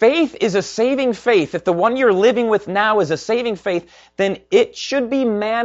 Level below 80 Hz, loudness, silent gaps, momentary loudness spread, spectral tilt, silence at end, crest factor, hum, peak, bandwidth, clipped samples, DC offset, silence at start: -56 dBFS; -17 LUFS; none; 6 LU; -5 dB/octave; 0 s; 16 dB; none; -2 dBFS; 8 kHz; under 0.1%; under 0.1%; 0 s